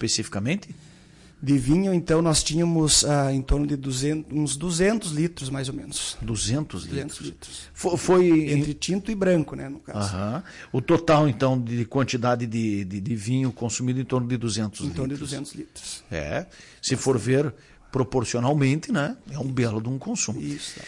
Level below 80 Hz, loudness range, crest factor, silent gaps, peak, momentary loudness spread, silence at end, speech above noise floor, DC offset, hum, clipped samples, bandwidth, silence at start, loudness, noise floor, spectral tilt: -42 dBFS; 6 LU; 16 dB; none; -8 dBFS; 13 LU; 0 s; 26 dB; under 0.1%; none; under 0.1%; 12 kHz; 0 s; -24 LUFS; -51 dBFS; -5 dB/octave